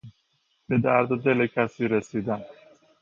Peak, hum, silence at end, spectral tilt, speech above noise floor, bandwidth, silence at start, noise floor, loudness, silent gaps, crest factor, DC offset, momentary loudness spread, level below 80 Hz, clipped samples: -6 dBFS; none; 0.5 s; -8 dB/octave; 46 dB; 7.4 kHz; 0.05 s; -70 dBFS; -25 LUFS; none; 20 dB; under 0.1%; 8 LU; -62 dBFS; under 0.1%